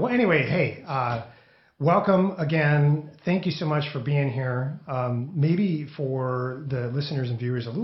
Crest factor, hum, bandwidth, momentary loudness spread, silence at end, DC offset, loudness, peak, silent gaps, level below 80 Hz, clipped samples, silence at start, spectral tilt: 18 dB; none; 6 kHz; 9 LU; 0 s; under 0.1%; -25 LUFS; -6 dBFS; none; -62 dBFS; under 0.1%; 0 s; -9 dB/octave